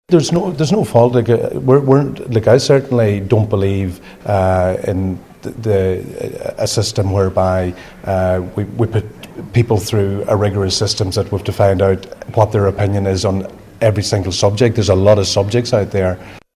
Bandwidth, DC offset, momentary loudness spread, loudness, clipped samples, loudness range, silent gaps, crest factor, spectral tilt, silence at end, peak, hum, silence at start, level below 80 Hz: 14.5 kHz; under 0.1%; 11 LU; -15 LUFS; under 0.1%; 5 LU; none; 14 dB; -6 dB/octave; 0.15 s; 0 dBFS; none; 0.1 s; -34 dBFS